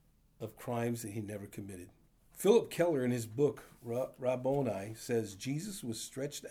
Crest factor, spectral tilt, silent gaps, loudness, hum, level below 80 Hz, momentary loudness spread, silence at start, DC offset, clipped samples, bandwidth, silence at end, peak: 20 dB; -5.5 dB/octave; none; -35 LUFS; none; -68 dBFS; 18 LU; 0.4 s; under 0.1%; under 0.1%; over 20 kHz; 0 s; -14 dBFS